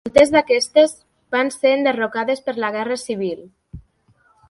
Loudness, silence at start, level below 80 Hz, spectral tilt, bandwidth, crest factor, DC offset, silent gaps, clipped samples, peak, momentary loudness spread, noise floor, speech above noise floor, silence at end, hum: -18 LUFS; 0.05 s; -52 dBFS; -3.5 dB/octave; 11.5 kHz; 20 dB; under 0.1%; none; under 0.1%; 0 dBFS; 11 LU; -59 dBFS; 41 dB; 0.7 s; none